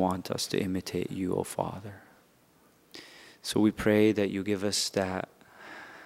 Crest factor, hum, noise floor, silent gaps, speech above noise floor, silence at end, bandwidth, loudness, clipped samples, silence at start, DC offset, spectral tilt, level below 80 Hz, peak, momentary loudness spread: 20 dB; none; -63 dBFS; none; 34 dB; 0 s; 16 kHz; -29 LUFS; under 0.1%; 0 s; under 0.1%; -4.5 dB/octave; -60 dBFS; -10 dBFS; 23 LU